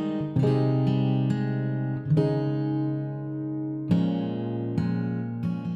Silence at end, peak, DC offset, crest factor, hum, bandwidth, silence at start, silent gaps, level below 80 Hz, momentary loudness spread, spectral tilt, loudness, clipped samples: 0 s; -10 dBFS; under 0.1%; 16 dB; none; 7.2 kHz; 0 s; none; -58 dBFS; 8 LU; -10 dB/octave; -27 LUFS; under 0.1%